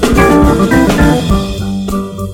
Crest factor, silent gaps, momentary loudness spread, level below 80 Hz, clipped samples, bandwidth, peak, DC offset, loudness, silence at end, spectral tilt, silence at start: 10 dB; none; 10 LU; -18 dBFS; 0.9%; 17.5 kHz; 0 dBFS; under 0.1%; -11 LUFS; 0 s; -6 dB/octave; 0 s